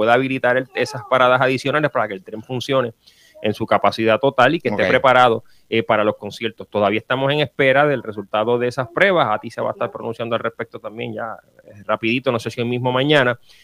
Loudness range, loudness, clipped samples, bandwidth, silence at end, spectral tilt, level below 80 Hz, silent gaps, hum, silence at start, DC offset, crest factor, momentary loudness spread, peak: 5 LU; -18 LUFS; under 0.1%; 15 kHz; 0.25 s; -6 dB/octave; -60 dBFS; none; none; 0 s; under 0.1%; 18 dB; 13 LU; 0 dBFS